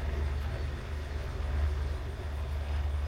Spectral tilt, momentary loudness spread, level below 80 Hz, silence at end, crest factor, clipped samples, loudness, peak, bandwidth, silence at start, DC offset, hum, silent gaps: -6.5 dB/octave; 5 LU; -34 dBFS; 0 s; 12 dB; under 0.1%; -36 LUFS; -20 dBFS; 10 kHz; 0 s; 0.1%; none; none